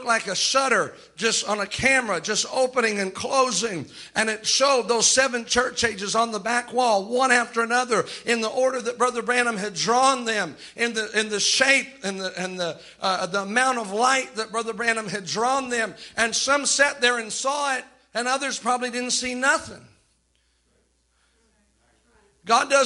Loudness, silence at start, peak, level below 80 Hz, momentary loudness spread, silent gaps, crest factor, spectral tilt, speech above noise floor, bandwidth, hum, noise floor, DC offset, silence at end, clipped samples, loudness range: -22 LUFS; 0 s; -4 dBFS; -62 dBFS; 9 LU; none; 20 dB; -1.5 dB/octave; 44 dB; 11.5 kHz; none; -67 dBFS; under 0.1%; 0 s; under 0.1%; 5 LU